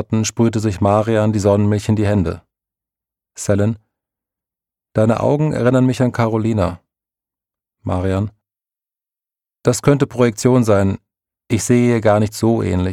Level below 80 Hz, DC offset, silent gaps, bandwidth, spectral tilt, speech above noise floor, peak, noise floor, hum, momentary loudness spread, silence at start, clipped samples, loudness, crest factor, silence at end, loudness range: -46 dBFS; under 0.1%; none; 14.5 kHz; -6.5 dB/octave; over 75 dB; -2 dBFS; under -90 dBFS; none; 9 LU; 0 s; under 0.1%; -17 LUFS; 16 dB; 0 s; 6 LU